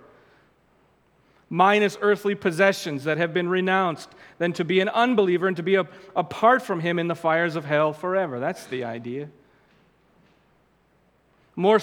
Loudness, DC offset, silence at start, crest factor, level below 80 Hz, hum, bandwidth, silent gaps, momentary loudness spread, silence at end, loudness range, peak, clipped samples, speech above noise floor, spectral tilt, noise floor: -23 LUFS; under 0.1%; 1.5 s; 20 dB; -72 dBFS; none; 16 kHz; none; 12 LU; 0 s; 8 LU; -4 dBFS; under 0.1%; 40 dB; -6 dB/octave; -63 dBFS